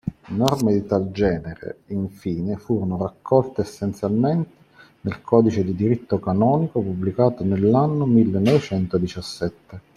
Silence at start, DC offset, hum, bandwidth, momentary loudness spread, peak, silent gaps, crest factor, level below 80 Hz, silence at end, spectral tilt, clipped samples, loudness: 0.05 s; under 0.1%; none; 15 kHz; 11 LU; -2 dBFS; none; 18 dB; -50 dBFS; 0.15 s; -8 dB/octave; under 0.1%; -21 LUFS